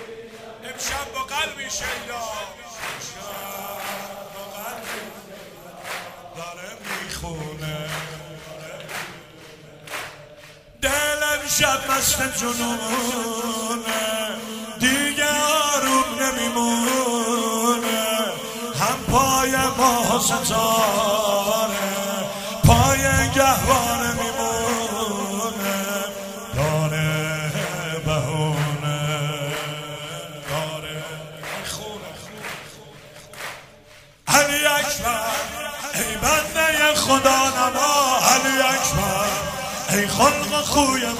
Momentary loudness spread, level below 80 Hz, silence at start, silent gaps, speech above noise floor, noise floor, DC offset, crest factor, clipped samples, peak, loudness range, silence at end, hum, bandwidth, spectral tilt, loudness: 17 LU; -42 dBFS; 0 s; none; 28 dB; -48 dBFS; under 0.1%; 22 dB; under 0.1%; 0 dBFS; 14 LU; 0 s; none; 16 kHz; -3 dB/octave; -21 LUFS